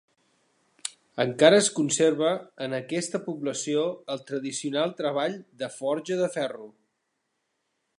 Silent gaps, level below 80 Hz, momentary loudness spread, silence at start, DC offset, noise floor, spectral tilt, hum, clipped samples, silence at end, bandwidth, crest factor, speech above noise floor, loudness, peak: none; -80 dBFS; 15 LU; 0.85 s; under 0.1%; -78 dBFS; -3.5 dB/octave; none; under 0.1%; 1.3 s; 11.5 kHz; 24 dB; 52 dB; -26 LUFS; -2 dBFS